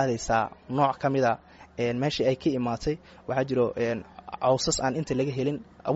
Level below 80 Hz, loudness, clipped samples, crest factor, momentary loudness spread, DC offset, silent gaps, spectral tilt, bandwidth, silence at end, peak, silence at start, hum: -52 dBFS; -27 LUFS; under 0.1%; 18 dB; 9 LU; under 0.1%; none; -5 dB/octave; 8 kHz; 0 s; -10 dBFS; 0 s; none